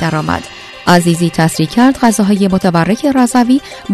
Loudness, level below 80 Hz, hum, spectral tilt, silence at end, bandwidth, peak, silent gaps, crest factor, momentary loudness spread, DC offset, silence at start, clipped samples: -12 LUFS; -42 dBFS; none; -5.5 dB/octave; 0 s; 14 kHz; 0 dBFS; none; 12 dB; 8 LU; under 0.1%; 0 s; 0.4%